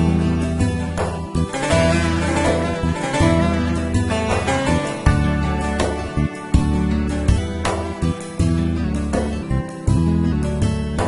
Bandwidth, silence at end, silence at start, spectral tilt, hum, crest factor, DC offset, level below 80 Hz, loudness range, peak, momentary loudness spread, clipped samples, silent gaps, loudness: 11.5 kHz; 0 s; 0 s; -6.5 dB/octave; none; 18 dB; under 0.1%; -26 dBFS; 2 LU; -2 dBFS; 6 LU; under 0.1%; none; -20 LUFS